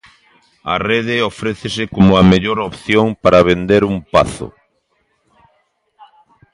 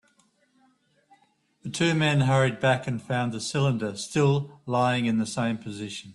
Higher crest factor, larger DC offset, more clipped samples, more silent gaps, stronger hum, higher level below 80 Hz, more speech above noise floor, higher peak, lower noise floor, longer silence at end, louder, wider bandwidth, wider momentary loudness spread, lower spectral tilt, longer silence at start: about the same, 16 dB vs 16 dB; neither; neither; neither; neither; first, -38 dBFS vs -62 dBFS; first, 50 dB vs 41 dB; first, 0 dBFS vs -10 dBFS; about the same, -63 dBFS vs -66 dBFS; first, 2.05 s vs 0 s; first, -14 LUFS vs -25 LUFS; about the same, 11 kHz vs 11.5 kHz; about the same, 11 LU vs 10 LU; about the same, -6.5 dB/octave vs -5.5 dB/octave; second, 0.65 s vs 1.65 s